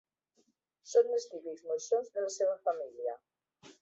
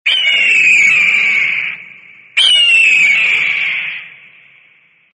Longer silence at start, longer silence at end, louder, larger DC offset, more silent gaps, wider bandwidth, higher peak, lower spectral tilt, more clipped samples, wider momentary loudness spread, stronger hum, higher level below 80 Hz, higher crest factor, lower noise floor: first, 0.85 s vs 0.05 s; second, 0.1 s vs 1.05 s; second, -34 LUFS vs -8 LUFS; neither; neither; second, 8 kHz vs 10.5 kHz; second, -16 dBFS vs 0 dBFS; first, -2 dB/octave vs 1.5 dB/octave; neither; about the same, 13 LU vs 13 LU; neither; second, -88 dBFS vs -70 dBFS; first, 20 dB vs 12 dB; first, -75 dBFS vs -50 dBFS